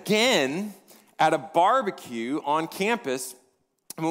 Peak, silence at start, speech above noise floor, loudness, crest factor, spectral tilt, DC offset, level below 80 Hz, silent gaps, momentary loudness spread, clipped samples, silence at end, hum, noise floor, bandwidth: -8 dBFS; 0 s; 43 dB; -25 LUFS; 18 dB; -3.5 dB/octave; under 0.1%; -76 dBFS; none; 13 LU; under 0.1%; 0 s; none; -68 dBFS; 16 kHz